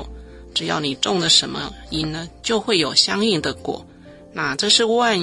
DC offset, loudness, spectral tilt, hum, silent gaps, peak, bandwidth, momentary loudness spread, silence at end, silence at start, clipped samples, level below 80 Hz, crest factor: under 0.1%; -19 LUFS; -2.5 dB/octave; none; none; -2 dBFS; 11.5 kHz; 15 LU; 0 s; 0 s; under 0.1%; -46 dBFS; 20 dB